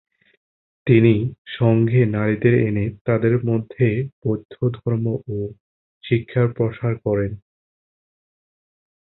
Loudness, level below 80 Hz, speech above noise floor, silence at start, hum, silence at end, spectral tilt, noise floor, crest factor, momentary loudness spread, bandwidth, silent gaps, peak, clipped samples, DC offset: -20 LUFS; -48 dBFS; over 71 dB; 0.85 s; none; 1.65 s; -13 dB/octave; under -90 dBFS; 18 dB; 12 LU; 4.1 kHz; 1.38-1.45 s, 3.01-3.05 s, 4.13-4.22 s, 4.45-4.49 s, 5.60-6.01 s; -2 dBFS; under 0.1%; under 0.1%